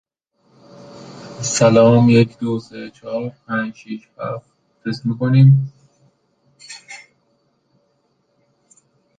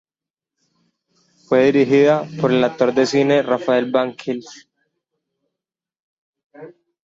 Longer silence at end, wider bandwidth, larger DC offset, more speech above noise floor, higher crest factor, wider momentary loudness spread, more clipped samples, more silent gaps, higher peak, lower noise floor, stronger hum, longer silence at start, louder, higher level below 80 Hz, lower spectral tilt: first, 2.2 s vs 0.35 s; first, 9.4 kHz vs 7.8 kHz; neither; second, 49 dB vs 73 dB; about the same, 18 dB vs 16 dB; first, 26 LU vs 10 LU; neither; second, none vs 6.00-6.33 s, 6.44-6.50 s; about the same, -2 dBFS vs -2 dBFS; second, -64 dBFS vs -89 dBFS; neither; second, 0.95 s vs 1.5 s; about the same, -16 LUFS vs -17 LUFS; first, -58 dBFS vs -64 dBFS; about the same, -6.5 dB/octave vs -6 dB/octave